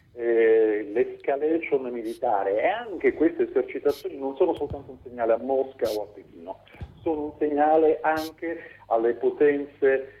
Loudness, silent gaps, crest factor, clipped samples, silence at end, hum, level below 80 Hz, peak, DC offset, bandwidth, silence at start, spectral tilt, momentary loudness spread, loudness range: -25 LUFS; none; 16 dB; under 0.1%; 0.1 s; none; -56 dBFS; -10 dBFS; under 0.1%; 14 kHz; 0.15 s; -6.5 dB/octave; 14 LU; 4 LU